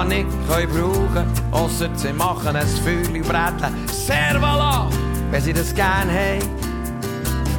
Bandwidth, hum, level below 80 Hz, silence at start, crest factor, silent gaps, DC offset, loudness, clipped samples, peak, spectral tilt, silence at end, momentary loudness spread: 19 kHz; none; -26 dBFS; 0 s; 14 dB; none; under 0.1%; -20 LUFS; under 0.1%; -4 dBFS; -5 dB/octave; 0 s; 6 LU